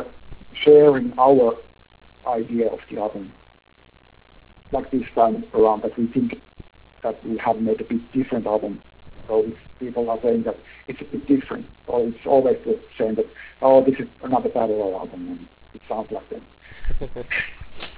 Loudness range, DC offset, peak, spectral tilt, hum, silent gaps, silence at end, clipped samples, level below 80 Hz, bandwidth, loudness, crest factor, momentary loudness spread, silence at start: 8 LU; under 0.1%; -2 dBFS; -10.5 dB/octave; none; none; 0.05 s; under 0.1%; -44 dBFS; 4 kHz; -21 LUFS; 20 dB; 19 LU; 0 s